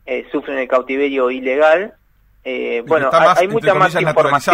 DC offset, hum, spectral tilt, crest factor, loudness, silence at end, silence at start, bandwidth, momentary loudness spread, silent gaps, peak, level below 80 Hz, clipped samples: under 0.1%; none; -5 dB/octave; 16 dB; -15 LUFS; 0 s; 0.05 s; 16 kHz; 11 LU; none; 0 dBFS; -54 dBFS; under 0.1%